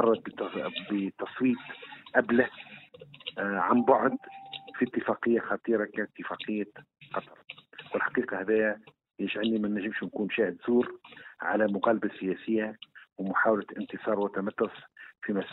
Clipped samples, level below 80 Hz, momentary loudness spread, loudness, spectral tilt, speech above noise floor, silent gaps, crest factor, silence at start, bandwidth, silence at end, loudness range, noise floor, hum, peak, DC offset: under 0.1%; -72 dBFS; 17 LU; -30 LUFS; -9.5 dB/octave; 22 dB; none; 22 dB; 0 s; 4.1 kHz; 0 s; 4 LU; -51 dBFS; none; -8 dBFS; under 0.1%